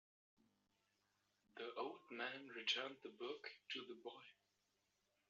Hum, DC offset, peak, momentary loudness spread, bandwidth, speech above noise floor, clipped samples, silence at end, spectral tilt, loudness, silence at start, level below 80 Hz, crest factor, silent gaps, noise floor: none; under 0.1%; -26 dBFS; 15 LU; 7.4 kHz; 36 dB; under 0.1%; 0.95 s; 1 dB/octave; -49 LUFS; 1.55 s; under -90 dBFS; 28 dB; none; -86 dBFS